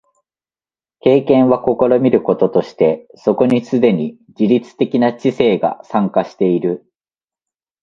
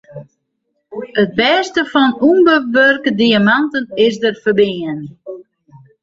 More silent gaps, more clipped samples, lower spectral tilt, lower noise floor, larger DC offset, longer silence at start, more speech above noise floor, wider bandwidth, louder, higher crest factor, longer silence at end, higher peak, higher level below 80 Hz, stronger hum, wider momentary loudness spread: neither; neither; first, -8.5 dB/octave vs -5.5 dB/octave; first, under -90 dBFS vs -70 dBFS; neither; first, 1.05 s vs 0.1 s; first, over 76 dB vs 57 dB; about the same, 7.2 kHz vs 7.8 kHz; about the same, -15 LUFS vs -13 LUFS; about the same, 16 dB vs 14 dB; first, 1.05 s vs 0.6 s; about the same, 0 dBFS vs 0 dBFS; about the same, -56 dBFS vs -56 dBFS; neither; second, 7 LU vs 19 LU